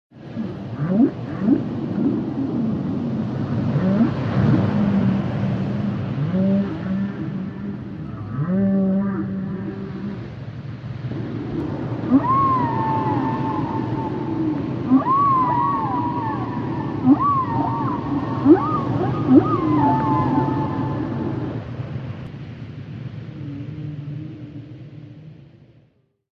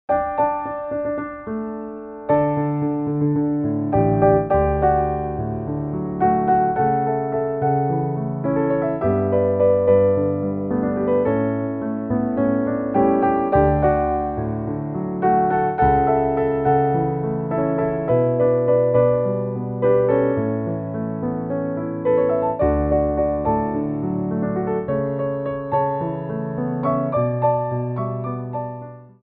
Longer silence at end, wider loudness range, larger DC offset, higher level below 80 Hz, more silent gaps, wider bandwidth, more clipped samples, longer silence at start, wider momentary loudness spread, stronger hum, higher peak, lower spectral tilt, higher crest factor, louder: first, 0.9 s vs 0.2 s; first, 11 LU vs 4 LU; neither; second, -46 dBFS vs -38 dBFS; neither; first, 6.4 kHz vs 3.8 kHz; neither; about the same, 0.15 s vs 0.1 s; first, 16 LU vs 9 LU; neither; about the same, -2 dBFS vs -4 dBFS; about the same, -10 dB/octave vs -9.5 dB/octave; about the same, 20 dB vs 16 dB; about the same, -21 LUFS vs -20 LUFS